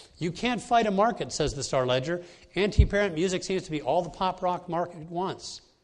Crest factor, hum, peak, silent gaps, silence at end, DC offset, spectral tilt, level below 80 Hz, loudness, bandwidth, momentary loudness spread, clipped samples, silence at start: 22 dB; none; -6 dBFS; none; 0.25 s; under 0.1%; -5 dB/octave; -36 dBFS; -28 LUFS; 11 kHz; 10 LU; under 0.1%; 0 s